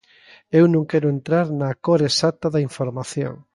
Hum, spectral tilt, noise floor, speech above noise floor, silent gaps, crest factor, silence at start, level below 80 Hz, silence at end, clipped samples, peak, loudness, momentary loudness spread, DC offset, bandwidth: none; -6 dB/octave; -51 dBFS; 31 dB; none; 16 dB; 0.5 s; -60 dBFS; 0.2 s; under 0.1%; -4 dBFS; -20 LUFS; 10 LU; under 0.1%; 11.5 kHz